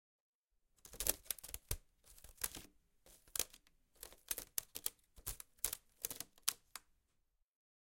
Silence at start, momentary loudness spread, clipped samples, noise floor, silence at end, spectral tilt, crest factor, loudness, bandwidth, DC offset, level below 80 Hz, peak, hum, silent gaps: 0.85 s; 18 LU; under 0.1%; -82 dBFS; 1.1 s; -0.5 dB/octave; 38 dB; -43 LUFS; 17 kHz; under 0.1%; -62 dBFS; -12 dBFS; none; none